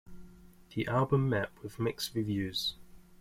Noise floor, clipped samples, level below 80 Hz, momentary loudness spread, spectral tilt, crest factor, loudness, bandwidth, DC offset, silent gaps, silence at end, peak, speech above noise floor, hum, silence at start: -54 dBFS; under 0.1%; -58 dBFS; 9 LU; -5.5 dB/octave; 20 dB; -33 LUFS; 16.5 kHz; under 0.1%; none; 0.05 s; -14 dBFS; 22 dB; none; 0.05 s